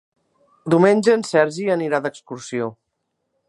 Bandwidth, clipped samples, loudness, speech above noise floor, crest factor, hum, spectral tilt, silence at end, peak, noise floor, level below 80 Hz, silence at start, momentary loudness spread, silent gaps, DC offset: 11.5 kHz; under 0.1%; -19 LUFS; 57 dB; 20 dB; none; -6 dB/octave; 0.75 s; -2 dBFS; -75 dBFS; -68 dBFS; 0.65 s; 15 LU; none; under 0.1%